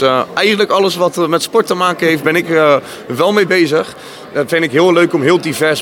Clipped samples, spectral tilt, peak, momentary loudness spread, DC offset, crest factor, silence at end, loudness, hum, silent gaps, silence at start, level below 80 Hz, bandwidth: under 0.1%; -4.5 dB/octave; 0 dBFS; 6 LU; under 0.1%; 12 dB; 0 s; -12 LUFS; none; none; 0 s; -60 dBFS; 18 kHz